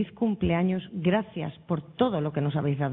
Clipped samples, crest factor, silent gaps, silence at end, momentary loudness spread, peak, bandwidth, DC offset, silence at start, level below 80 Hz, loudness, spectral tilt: under 0.1%; 18 dB; none; 0 s; 7 LU; -10 dBFS; 4 kHz; under 0.1%; 0 s; -50 dBFS; -28 LUFS; -11.5 dB/octave